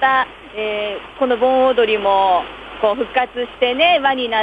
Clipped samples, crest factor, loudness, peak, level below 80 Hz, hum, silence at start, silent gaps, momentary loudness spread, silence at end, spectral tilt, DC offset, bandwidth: under 0.1%; 14 dB; -17 LUFS; -2 dBFS; -50 dBFS; none; 0 s; none; 10 LU; 0 s; -5 dB/octave; under 0.1%; 5 kHz